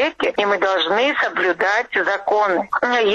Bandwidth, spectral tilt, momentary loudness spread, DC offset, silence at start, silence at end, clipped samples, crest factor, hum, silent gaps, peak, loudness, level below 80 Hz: 10.5 kHz; -3.5 dB/octave; 2 LU; under 0.1%; 0 s; 0 s; under 0.1%; 12 dB; none; none; -6 dBFS; -18 LUFS; -60 dBFS